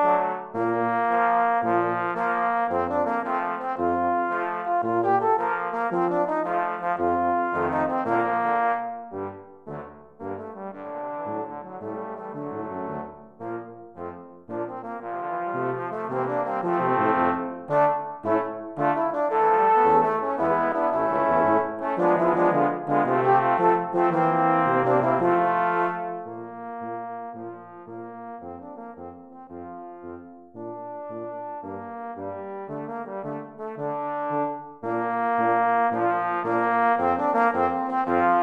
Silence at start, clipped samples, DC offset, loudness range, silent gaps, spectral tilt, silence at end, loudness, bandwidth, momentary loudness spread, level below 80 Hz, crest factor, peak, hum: 0 s; under 0.1%; under 0.1%; 15 LU; none; -8.5 dB/octave; 0 s; -24 LUFS; 6.2 kHz; 17 LU; -64 dBFS; 18 dB; -8 dBFS; none